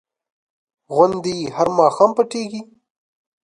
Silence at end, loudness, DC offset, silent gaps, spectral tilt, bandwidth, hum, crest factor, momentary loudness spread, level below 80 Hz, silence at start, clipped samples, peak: 0.8 s; -18 LUFS; under 0.1%; none; -5.5 dB/octave; 11 kHz; none; 20 dB; 13 LU; -60 dBFS; 0.9 s; under 0.1%; 0 dBFS